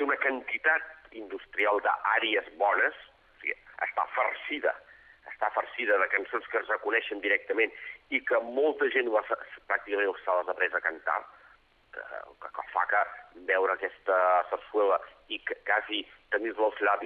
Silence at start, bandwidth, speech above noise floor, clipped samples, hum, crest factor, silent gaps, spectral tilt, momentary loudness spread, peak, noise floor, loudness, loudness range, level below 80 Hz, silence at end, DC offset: 0 s; 4.7 kHz; 31 dB; under 0.1%; none; 18 dB; none; -4.5 dB/octave; 14 LU; -10 dBFS; -60 dBFS; -29 LUFS; 3 LU; -70 dBFS; 0 s; under 0.1%